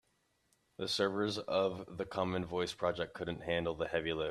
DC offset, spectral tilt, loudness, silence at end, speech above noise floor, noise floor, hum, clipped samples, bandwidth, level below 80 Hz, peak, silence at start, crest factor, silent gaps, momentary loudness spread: under 0.1%; -5 dB/octave; -36 LUFS; 0 s; 41 dB; -77 dBFS; none; under 0.1%; 13.5 kHz; -64 dBFS; -18 dBFS; 0.8 s; 18 dB; none; 7 LU